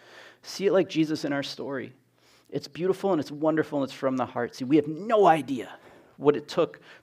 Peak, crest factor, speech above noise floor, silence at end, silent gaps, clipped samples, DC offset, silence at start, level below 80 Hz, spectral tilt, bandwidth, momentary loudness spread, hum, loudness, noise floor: -6 dBFS; 20 dB; 34 dB; 0.1 s; none; under 0.1%; under 0.1%; 0.15 s; -76 dBFS; -6 dB/octave; 15 kHz; 15 LU; none; -26 LUFS; -60 dBFS